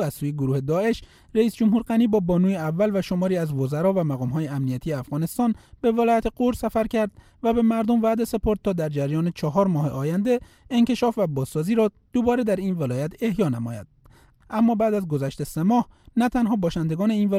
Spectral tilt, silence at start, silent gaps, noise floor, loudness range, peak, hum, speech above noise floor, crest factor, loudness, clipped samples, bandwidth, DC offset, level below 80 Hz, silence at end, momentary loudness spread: -7.5 dB/octave; 0 s; none; -54 dBFS; 2 LU; -8 dBFS; none; 31 dB; 16 dB; -23 LUFS; under 0.1%; 16 kHz; under 0.1%; -46 dBFS; 0 s; 7 LU